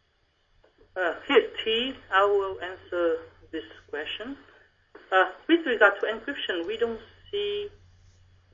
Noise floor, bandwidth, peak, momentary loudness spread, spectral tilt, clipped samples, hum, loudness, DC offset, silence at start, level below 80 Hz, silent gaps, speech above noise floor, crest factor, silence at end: -69 dBFS; 7.4 kHz; -4 dBFS; 17 LU; -4.5 dB/octave; under 0.1%; none; -26 LUFS; under 0.1%; 0.95 s; -62 dBFS; none; 42 dB; 24 dB; 0.85 s